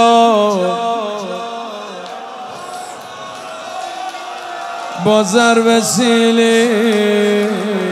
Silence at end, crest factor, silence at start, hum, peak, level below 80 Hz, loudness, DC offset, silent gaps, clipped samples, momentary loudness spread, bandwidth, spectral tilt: 0 s; 14 dB; 0 s; none; 0 dBFS; -66 dBFS; -14 LUFS; under 0.1%; none; under 0.1%; 17 LU; 15 kHz; -4 dB/octave